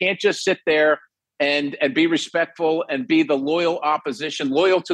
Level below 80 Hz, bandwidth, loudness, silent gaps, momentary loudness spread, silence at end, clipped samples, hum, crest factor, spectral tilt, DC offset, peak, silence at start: -70 dBFS; 10 kHz; -20 LUFS; none; 6 LU; 0 s; under 0.1%; none; 14 dB; -4 dB/octave; under 0.1%; -6 dBFS; 0 s